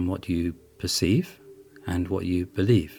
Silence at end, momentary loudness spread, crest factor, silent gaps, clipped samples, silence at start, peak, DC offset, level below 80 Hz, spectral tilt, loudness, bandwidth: 0 s; 11 LU; 18 dB; none; under 0.1%; 0 s; -8 dBFS; under 0.1%; -46 dBFS; -5.5 dB/octave; -26 LUFS; 19 kHz